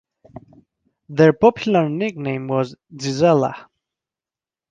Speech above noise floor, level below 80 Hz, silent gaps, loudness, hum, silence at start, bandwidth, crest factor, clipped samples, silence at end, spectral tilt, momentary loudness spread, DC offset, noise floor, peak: over 72 dB; -58 dBFS; none; -19 LUFS; none; 0.35 s; 8.8 kHz; 18 dB; under 0.1%; 1.1 s; -6.5 dB/octave; 14 LU; under 0.1%; under -90 dBFS; -2 dBFS